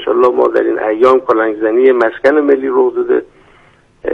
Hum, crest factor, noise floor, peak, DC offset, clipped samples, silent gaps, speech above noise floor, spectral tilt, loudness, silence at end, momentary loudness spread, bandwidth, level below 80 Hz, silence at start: none; 12 dB; -47 dBFS; 0 dBFS; under 0.1%; under 0.1%; none; 36 dB; -6 dB/octave; -12 LUFS; 0 s; 5 LU; 5.6 kHz; -52 dBFS; 0 s